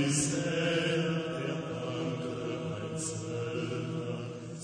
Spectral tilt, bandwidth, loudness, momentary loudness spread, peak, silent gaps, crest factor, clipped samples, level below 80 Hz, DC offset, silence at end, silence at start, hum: -4.5 dB/octave; 9.8 kHz; -33 LUFS; 8 LU; -18 dBFS; none; 16 dB; under 0.1%; -64 dBFS; under 0.1%; 0 s; 0 s; none